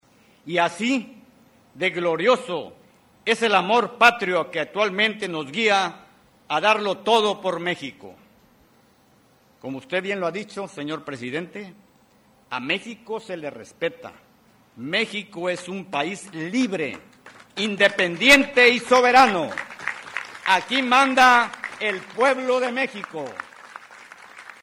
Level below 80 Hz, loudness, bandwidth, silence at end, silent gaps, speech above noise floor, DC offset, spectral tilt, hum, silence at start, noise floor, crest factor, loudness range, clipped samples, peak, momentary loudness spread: -62 dBFS; -21 LUFS; 16.5 kHz; 0.1 s; none; 36 dB; under 0.1%; -3.5 dB/octave; none; 0.45 s; -58 dBFS; 20 dB; 13 LU; under 0.1%; -4 dBFS; 18 LU